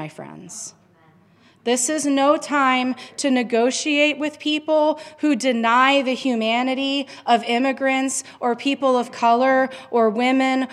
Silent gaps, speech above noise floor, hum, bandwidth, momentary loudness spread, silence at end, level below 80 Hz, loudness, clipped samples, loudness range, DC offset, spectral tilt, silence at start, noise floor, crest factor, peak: none; 34 dB; none; 13 kHz; 8 LU; 0 s; -78 dBFS; -19 LUFS; under 0.1%; 2 LU; under 0.1%; -2.5 dB/octave; 0 s; -54 dBFS; 18 dB; -2 dBFS